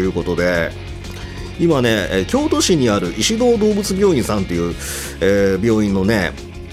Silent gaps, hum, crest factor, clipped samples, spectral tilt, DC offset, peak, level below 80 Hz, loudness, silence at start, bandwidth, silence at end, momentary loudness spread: none; none; 14 dB; under 0.1%; -5 dB/octave; under 0.1%; -2 dBFS; -34 dBFS; -17 LUFS; 0 s; 16 kHz; 0 s; 14 LU